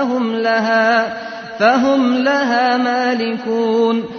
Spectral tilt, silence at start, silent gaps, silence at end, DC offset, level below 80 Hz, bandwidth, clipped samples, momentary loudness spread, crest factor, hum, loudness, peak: -5 dB/octave; 0 s; none; 0 s; under 0.1%; -60 dBFS; 6.6 kHz; under 0.1%; 6 LU; 14 dB; none; -15 LUFS; -2 dBFS